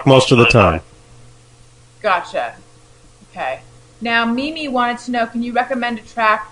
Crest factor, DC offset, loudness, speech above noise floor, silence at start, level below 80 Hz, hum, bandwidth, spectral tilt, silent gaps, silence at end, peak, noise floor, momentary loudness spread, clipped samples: 18 dB; under 0.1%; -16 LUFS; 30 dB; 0 s; -42 dBFS; none; 11 kHz; -5.5 dB/octave; none; 0.05 s; 0 dBFS; -46 dBFS; 15 LU; 0.1%